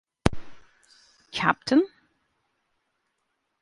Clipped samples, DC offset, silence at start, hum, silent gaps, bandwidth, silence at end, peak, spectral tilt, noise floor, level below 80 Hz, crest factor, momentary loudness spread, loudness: under 0.1%; under 0.1%; 0.25 s; none; none; 11.5 kHz; 1.75 s; 0 dBFS; -5.5 dB/octave; -77 dBFS; -46 dBFS; 30 dB; 13 LU; -25 LUFS